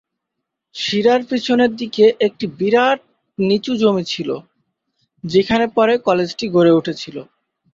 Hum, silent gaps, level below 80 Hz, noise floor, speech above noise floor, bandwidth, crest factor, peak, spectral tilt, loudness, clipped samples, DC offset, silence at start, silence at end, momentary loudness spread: none; none; -56 dBFS; -79 dBFS; 63 dB; 7.6 kHz; 16 dB; -2 dBFS; -5.5 dB/octave; -17 LUFS; under 0.1%; under 0.1%; 0.75 s; 0.5 s; 14 LU